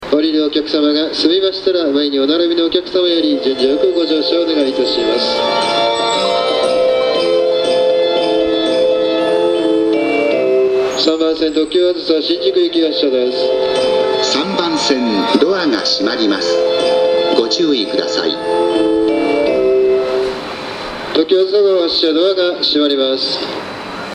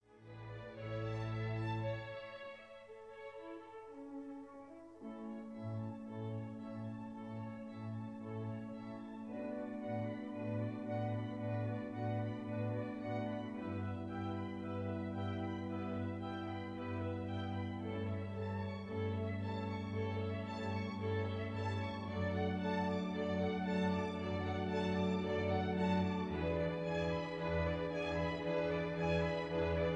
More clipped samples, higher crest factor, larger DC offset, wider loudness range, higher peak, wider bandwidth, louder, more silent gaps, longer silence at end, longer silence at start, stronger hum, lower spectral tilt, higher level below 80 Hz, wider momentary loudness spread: neither; about the same, 14 dB vs 16 dB; neither; second, 1 LU vs 10 LU; first, 0 dBFS vs -24 dBFS; first, 10.5 kHz vs 8.4 kHz; first, -14 LUFS vs -41 LUFS; neither; about the same, 0 s vs 0 s; about the same, 0 s vs 0.1 s; neither; second, -3.5 dB/octave vs -8 dB/octave; first, -50 dBFS vs -60 dBFS; second, 3 LU vs 13 LU